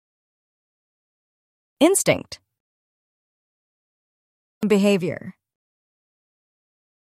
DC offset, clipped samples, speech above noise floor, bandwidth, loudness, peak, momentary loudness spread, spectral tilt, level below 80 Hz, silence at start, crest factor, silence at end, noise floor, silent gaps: under 0.1%; under 0.1%; over 70 dB; 16 kHz; -20 LUFS; -6 dBFS; 19 LU; -4.5 dB/octave; -66 dBFS; 1.8 s; 22 dB; 1.75 s; under -90 dBFS; 2.60-4.61 s